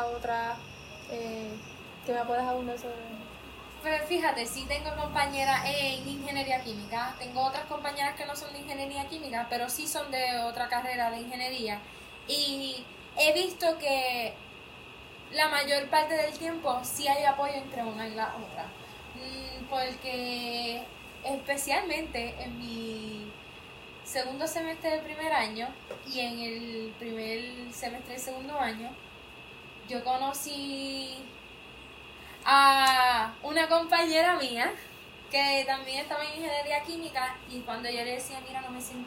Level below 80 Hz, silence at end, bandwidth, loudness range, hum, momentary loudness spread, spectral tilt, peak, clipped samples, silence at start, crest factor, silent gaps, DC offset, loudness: -56 dBFS; 0 s; 16 kHz; 10 LU; none; 19 LU; -2.5 dB/octave; -10 dBFS; under 0.1%; 0 s; 22 dB; none; under 0.1%; -30 LUFS